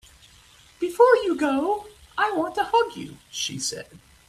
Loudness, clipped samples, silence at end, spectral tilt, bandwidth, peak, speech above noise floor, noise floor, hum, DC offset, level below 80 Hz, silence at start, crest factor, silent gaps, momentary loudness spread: -23 LUFS; under 0.1%; 0.3 s; -3 dB/octave; 14 kHz; -4 dBFS; 30 dB; -53 dBFS; none; under 0.1%; -60 dBFS; 0.8 s; 20 dB; none; 17 LU